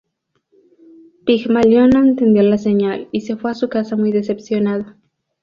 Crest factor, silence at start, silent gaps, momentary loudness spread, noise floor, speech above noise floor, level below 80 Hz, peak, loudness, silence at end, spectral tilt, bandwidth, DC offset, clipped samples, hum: 14 dB; 1.25 s; none; 12 LU; -66 dBFS; 51 dB; -50 dBFS; -2 dBFS; -16 LUFS; 0.5 s; -7.5 dB/octave; 7.2 kHz; under 0.1%; under 0.1%; none